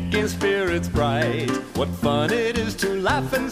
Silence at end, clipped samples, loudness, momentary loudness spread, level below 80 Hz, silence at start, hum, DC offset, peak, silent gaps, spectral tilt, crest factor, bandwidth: 0 s; under 0.1%; -22 LUFS; 4 LU; -40 dBFS; 0 s; none; under 0.1%; -6 dBFS; none; -5 dB/octave; 16 dB; 15.5 kHz